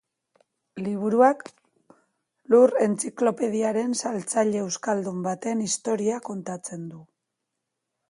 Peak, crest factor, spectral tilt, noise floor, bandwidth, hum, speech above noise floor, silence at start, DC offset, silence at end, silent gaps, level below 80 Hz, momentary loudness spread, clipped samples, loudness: -6 dBFS; 20 dB; -5 dB/octave; -82 dBFS; 11.5 kHz; none; 58 dB; 0.75 s; under 0.1%; 1.05 s; none; -74 dBFS; 15 LU; under 0.1%; -24 LUFS